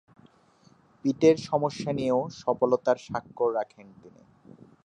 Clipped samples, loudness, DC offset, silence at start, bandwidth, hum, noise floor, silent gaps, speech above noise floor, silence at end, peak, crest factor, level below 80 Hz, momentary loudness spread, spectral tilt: under 0.1%; -27 LUFS; under 0.1%; 1.05 s; 9.2 kHz; none; -60 dBFS; none; 34 dB; 0.8 s; -8 dBFS; 20 dB; -66 dBFS; 10 LU; -6.5 dB/octave